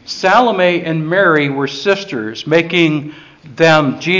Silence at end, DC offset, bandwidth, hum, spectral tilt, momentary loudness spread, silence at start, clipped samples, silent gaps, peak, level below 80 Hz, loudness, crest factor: 0 s; under 0.1%; 7.6 kHz; none; -5.5 dB/octave; 9 LU; 0.05 s; under 0.1%; none; 0 dBFS; -56 dBFS; -13 LUFS; 14 dB